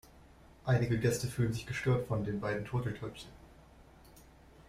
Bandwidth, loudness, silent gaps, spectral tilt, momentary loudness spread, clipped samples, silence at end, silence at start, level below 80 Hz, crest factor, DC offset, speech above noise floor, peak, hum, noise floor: 15.5 kHz; -34 LUFS; none; -6.5 dB/octave; 12 LU; under 0.1%; 0.05 s; 0.15 s; -56 dBFS; 18 dB; under 0.1%; 25 dB; -18 dBFS; none; -58 dBFS